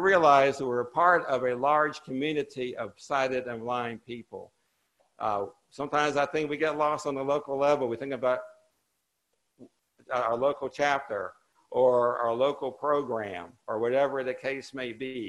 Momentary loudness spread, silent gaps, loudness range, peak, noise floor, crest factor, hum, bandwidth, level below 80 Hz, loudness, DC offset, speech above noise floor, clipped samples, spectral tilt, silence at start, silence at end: 13 LU; none; 5 LU; -8 dBFS; -79 dBFS; 22 dB; none; 11.5 kHz; -70 dBFS; -28 LUFS; under 0.1%; 51 dB; under 0.1%; -5 dB/octave; 0 s; 0 s